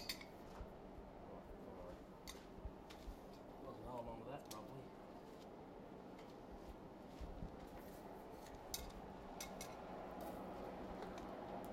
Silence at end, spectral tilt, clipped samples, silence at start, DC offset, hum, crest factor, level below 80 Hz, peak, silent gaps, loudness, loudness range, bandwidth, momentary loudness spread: 0 s; -4.5 dB/octave; under 0.1%; 0 s; under 0.1%; none; 26 dB; -62 dBFS; -28 dBFS; none; -54 LUFS; 4 LU; 16 kHz; 6 LU